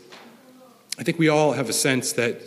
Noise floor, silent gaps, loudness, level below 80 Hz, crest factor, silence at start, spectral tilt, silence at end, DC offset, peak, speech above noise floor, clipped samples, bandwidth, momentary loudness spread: -51 dBFS; none; -21 LUFS; -70 dBFS; 18 dB; 0.1 s; -4 dB/octave; 0 s; under 0.1%; -4 dBFS; 29 dB; under 0.1%; 15.5 kHz; 9 LU